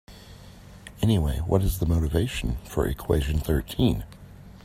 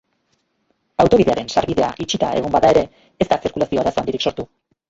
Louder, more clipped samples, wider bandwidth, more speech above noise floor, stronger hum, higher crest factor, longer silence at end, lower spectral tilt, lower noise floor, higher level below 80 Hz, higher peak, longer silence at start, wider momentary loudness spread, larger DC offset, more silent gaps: second, -26 LUFS vs -18 LUFS; neither; first, 16 kHz vs 8 kHz; second, 22 dB vs 50 dB; neither; about the same, 20 dB vs 18 dB; second, 0.05 s vs 0.45 s; about the same, -6.5 dB/octave vs -5.5 dB/octave; second, -46 dBFS vs -67 dBFS; first, -34 dBFS vs -44 dBFS; second, -6 dBFS vs -2 dBFS; second, 0.1 s vs 1 s; first, 21 LU vs 11 LU; neither; neither